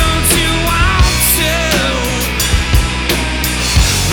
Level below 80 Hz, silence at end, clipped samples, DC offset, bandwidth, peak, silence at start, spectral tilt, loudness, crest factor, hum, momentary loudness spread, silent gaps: -18 dBFS; 0 s; under 0.1%; under 0.1%; over 20 kHz; 0 dBFS; 0 s; -3 dB/octave; -12 LUFS; 12 dB; none; 4 LU; none